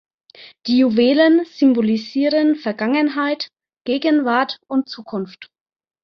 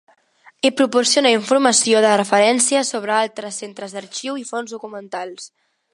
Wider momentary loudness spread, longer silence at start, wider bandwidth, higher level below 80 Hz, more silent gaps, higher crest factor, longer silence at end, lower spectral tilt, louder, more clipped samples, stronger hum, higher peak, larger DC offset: about the same, 14 LU vs 16 LU; second, 0.4 s vs 0.65 s; second, 6.4 kHz vs 11.5 kHz; first, -66 dBFS vs -74 dBFS; neither; about the same, 16 dB vs 18 dB; first, 0.6 s vs 0.45 s; first, -6.5 dB/octave vs -2 dB/octave; about the same, -18 LUFS vs -16 LUFS; neither; neither; about the same, -2 dBFS vs 0 dBFS; neither